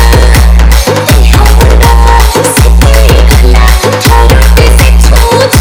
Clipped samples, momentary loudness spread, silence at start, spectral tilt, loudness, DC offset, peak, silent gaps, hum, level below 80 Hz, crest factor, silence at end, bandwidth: 40%; 2 LU; 0 s; -4.5 dB/octave; -5 LUFS; under 0.1%; 0 dBFS; none; none; -4 dBFS; 2 dB; 0 s; 18.5 kHz